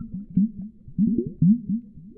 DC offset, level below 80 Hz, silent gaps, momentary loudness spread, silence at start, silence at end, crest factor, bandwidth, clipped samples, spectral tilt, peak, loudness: under 0.1%; -48 dBFS; none; 11 LU; 0 s; 0.05 s; 16 dB; 0.6 kHz; under 0.1%; -16.5 dB/octave; -8 dBFS; -24 LUFS